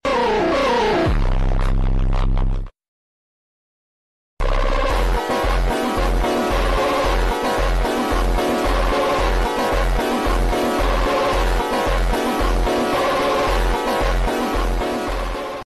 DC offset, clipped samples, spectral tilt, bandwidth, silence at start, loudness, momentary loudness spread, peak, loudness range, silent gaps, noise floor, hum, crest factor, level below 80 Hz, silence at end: 0.3%; under 0.1%; -5 dB/octave; 13 kHz; 0.05 s; -20 LUFS; 4 LU; -10 dBFS; 6 LU; 2.88-4.37 s; under -90 dBFS; none; 8 dB; -22 dBFS; 0 s